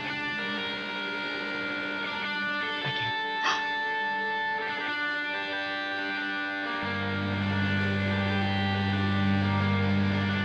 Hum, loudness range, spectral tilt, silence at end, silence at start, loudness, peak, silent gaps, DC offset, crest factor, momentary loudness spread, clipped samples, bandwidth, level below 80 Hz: none; 3 LU; -6 dB/octave; 0 s; 0 s; -29 LUFS; -14 dBFS; none; under 0.1%; 16 dB; 5 LU; under 0.1%; 8 kHz; -64 dBFS